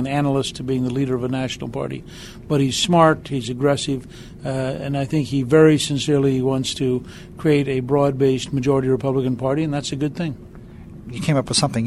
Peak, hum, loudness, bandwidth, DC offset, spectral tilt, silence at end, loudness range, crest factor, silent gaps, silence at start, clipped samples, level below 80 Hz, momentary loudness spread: -2 dBFS; none; -20 LUFS; 13 kHz; under 0.1%; -5.5 dB/octave; 0 s; 3 LU; 18 dB; none; 0 s; under 0.1%; -46 dBFS; 13 LU